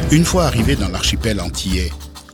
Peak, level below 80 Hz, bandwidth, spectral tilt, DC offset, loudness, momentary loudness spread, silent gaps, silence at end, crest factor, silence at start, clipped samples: 0 dBFS; -24 dBFS; 19 kHz; -4.5 dB/octave; under 0.1%; -17 LUFS; 8 LU; none; 0.1 s; 16 dB; 0 s; under 0.1%